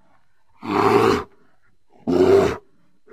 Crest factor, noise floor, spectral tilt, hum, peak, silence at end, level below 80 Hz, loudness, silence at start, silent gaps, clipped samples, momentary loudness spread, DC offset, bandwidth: 18 dB; -63 dBFS; -6.5 dB/octave; none; -4 dBFS; 0.55 s; -48 dBFS; -18 LUFS; 0.65 s; none; under 0.1%; 19 LU; 0.2%; 14.5 kHz